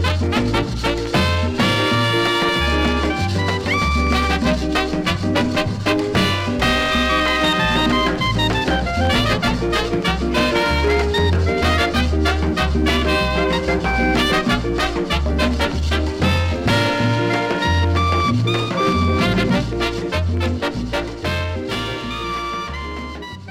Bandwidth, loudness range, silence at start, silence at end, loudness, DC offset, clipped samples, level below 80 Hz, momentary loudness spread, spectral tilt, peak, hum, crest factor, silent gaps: 16 kHz; 2 LU; 0 s; 0 s; -18 LUFS; under 0.1%; under 0.1%; -26 dBFS; 6 LU; -5.5 dB/octave; -6 dBFS; none; 12 dB; none